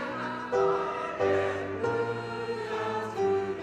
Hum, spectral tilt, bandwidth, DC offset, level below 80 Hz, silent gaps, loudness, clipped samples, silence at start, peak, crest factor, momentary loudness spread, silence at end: none; -6 dB/octave; 9.4 kHz; under 0.1%; -64 dBFS; none; -30 LUFS; under 0.1%; 0 s; -14 dBFS; 16 dB; 7 LU; 0 s